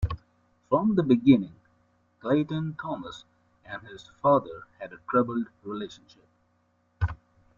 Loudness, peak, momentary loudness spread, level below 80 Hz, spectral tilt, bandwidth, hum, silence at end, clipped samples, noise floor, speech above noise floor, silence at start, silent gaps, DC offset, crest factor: -26 LUFS; -6 dBFS; 20 LU; -48 dBFS; -8.5 dB/octave; 7.4 kHz; none; 0.45 s; under 0.1%; -69 dBFS; 43 dB; 0 s; none; under 0.1%; 22 dB